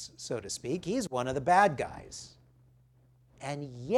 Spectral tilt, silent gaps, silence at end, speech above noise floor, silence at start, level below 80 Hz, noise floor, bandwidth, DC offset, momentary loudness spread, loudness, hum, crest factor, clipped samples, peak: -4.5 dB/octave; none; 0 s; 33 dB; 0 s; -62 dBFS; -63 dBFS; 14.5 kHz; under 0.1%; 20 LU; -31 LUFS; none; 22 dB; under 0.1%; -10 dBFS